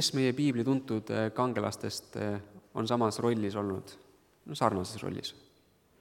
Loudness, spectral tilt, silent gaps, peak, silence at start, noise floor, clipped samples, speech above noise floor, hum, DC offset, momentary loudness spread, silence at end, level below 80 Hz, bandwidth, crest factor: -32 LUFS; -5 dB/octave; none; -10 dBFS; 0 s; -66 dBFS; under 0.1%; 34 dB; none; under 0.1%; 12 LU; 0.65 s; -70 dBFS; 17 kHz; 22 dB